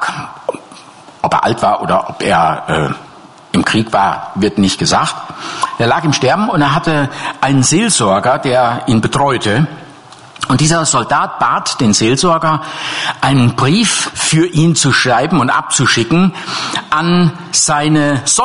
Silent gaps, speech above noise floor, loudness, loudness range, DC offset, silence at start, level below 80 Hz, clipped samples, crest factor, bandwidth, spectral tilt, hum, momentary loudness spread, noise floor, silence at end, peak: none; 25 dB; -12 LUFS; 3 LU; under 0.1%; 0 s; -42 dBFS; under 0.1%; 12 dB; 11 kHz; -4 dB/octave; none; 9 LU; -37 dBFS; 0 s; 0 dBFS